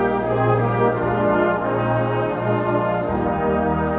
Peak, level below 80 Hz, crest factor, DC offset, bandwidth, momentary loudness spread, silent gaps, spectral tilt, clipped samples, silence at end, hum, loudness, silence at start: -6 dBFS; -40 dBFS; 14 dB; under 0.1%; 4.1 kHz; 3 LU; none; -12.5 dB/octave; under 0.1%; 0 s; none; -20 LUFS; 0 s